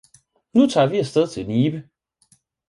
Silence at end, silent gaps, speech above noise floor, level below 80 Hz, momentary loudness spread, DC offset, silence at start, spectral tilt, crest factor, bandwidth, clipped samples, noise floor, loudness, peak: 0.85 s; none; 42 dB; -58 dBFS; 6 LU; under 0.1%; 0.55 s; -6.5 dB/octave; 18 dB; 11.5 kHz; under 0.1%; -61 dBFS; -20 LUFS; -4 dBFS